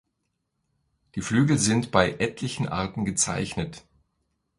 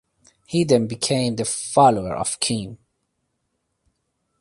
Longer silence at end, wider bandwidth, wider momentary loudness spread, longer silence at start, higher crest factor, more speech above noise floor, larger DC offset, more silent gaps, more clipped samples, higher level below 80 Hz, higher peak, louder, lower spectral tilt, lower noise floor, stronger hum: second, 0.8 s vs 1.65 s; about the same, 11.5 kHz vs 11.5 kHz; about the same, 12 LU vs 10 LU; first, 1.15 s vs 0.5 s; first, 26 dB vs 20 dB; about the same, 53 dB vs 54 dB; neither; neither; neither; about the same, -50 dBFS vs -54 dBFS; about the same, -2 dBFS vs -2 dBFS; second, -25 LUFS vs -20 LUFS; about the same, -4.5 dB/octave vs -4.5 dB/octave; first, -78 dBFS vs -74 dBFS; neither